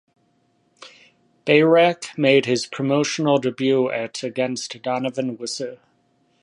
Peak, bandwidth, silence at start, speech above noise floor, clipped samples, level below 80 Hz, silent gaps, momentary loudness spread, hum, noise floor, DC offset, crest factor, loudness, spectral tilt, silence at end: -2 dBFS; 11.5 kHz; 0.8 s; 44 dB; under 0.1%; -72 dBFS; none; 12 LU; none; -64 dBFS; under 0.1%; 20 dB; -20 LUFS; -4.5 dB/octave; 0.65 s